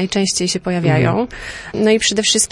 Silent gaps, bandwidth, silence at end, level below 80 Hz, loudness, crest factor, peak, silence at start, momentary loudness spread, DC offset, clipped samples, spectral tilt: none; 11.5 kHz; 0.05 s; -44 dBFS; -16 LUFS; 14 dB; -2 dBFS; 0 s; 11 LU; under 0.1%; under 0.1%; -3.5 dB/octave